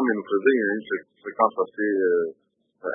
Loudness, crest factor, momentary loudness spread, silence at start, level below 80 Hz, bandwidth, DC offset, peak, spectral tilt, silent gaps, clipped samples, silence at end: -24 LUFS; 20 dB; 11 LU; 0 s; -80 dBFS; 3.7 kHz; under 0.1%; -4 dBFS; -10 dB/octave; none; under 0.1%; 0 s